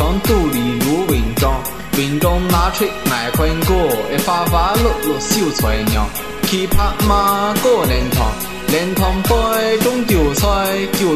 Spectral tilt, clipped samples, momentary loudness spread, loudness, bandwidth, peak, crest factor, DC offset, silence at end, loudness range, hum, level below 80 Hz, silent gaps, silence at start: -4.5 dB/octave; under 0.1%; 4 LU; -16 LUFS; 14.5 kHz; 0 dBFS; 14 dB; 1%; 0 s; 1 LU; none; -22 dBFS; none; 0 s